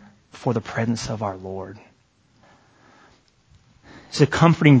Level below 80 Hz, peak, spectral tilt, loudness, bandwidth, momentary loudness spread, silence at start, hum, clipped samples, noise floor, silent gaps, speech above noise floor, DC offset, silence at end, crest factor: -50 dBFS; 0 dBFS; -6.5 dB/octave; -21 LUFS; 8 kHz; 18 LU; 0.35 s; none; under 0.1%; -60 dBFS; none; 41 dB; under 0.1%; 0 s; 22 dB